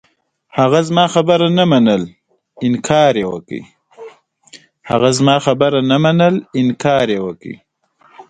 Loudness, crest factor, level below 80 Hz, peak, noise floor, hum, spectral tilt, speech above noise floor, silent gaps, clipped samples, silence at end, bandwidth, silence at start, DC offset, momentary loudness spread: -14 LUFS; 14 dB; -52 dBFS; 0 dBFS; -52 dBFS; none; -5.5 dB/octave; 39 dB; none; under 0.1%; 0.1 s; 9.4 kHz; 0.55 s; under 0.1%; 14 LU